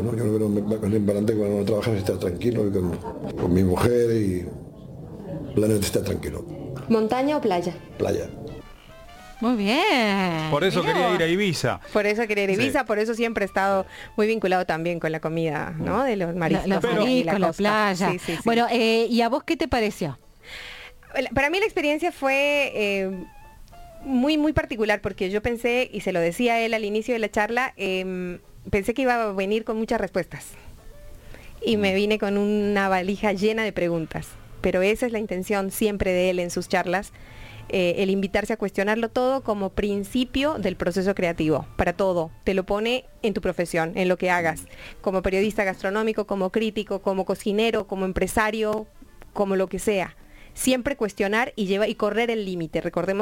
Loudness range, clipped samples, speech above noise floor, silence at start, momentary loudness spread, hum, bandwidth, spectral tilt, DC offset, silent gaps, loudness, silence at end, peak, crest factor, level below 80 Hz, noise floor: 3 LU; under 0.1%; 21 dB; 0 s; 10 LU; none; 17 kHz; -5.5 dB/octave; under 0.1%; none; -24 LUFS; 0 s; -4 dBFS; 20 dB; -46 dBFS; -44 dBFS